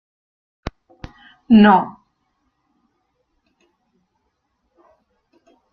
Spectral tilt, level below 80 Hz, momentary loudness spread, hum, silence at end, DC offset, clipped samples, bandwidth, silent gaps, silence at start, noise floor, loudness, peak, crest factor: -8.5 dB/octave; -50 dBFS; 29 LU; none; 3.85 s; under 0.1%; under 0.1%; 5.2 kHz; none; 0.65 s; -71 dBFS; -13 LUFS; -2 dBFS; 20 dB